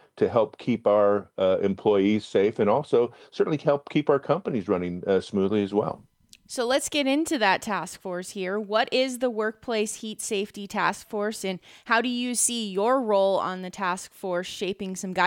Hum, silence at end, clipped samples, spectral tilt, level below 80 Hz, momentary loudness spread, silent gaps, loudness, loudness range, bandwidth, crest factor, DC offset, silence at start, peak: none; 0 s; under 0.1%; -4 dB/octave; -66 dBFS; 9 LU; none; -25 LUFS; 4 LU; 17 kHz; 18 dB; under 0.1%; 0.15 s; -8 dBFS